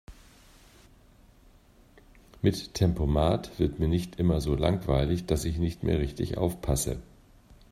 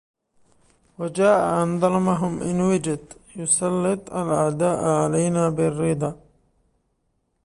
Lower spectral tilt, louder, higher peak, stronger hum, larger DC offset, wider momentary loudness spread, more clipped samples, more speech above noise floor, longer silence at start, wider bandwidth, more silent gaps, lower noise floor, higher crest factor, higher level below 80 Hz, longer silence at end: about the same, -6.5 dB/octave vs -6 dB/octave; second, -28 LUFS vs -22 LUFS; about the same, -8 dBFS vs -6 dBFS; neither; neither; second, 4 LU vs 10 LU; neither; second, 30 dB vs 50 dB; second, 0.1 s vs 1 s; first, 15.5 kHz vs 11.5 kHz; neither; second, -57 dBFS vs -71 dBFS; about the same, 20 dB vs 18 dB; first, -40 dBFS vs -54 dBFS; second, 0.65 s vs 1.3 s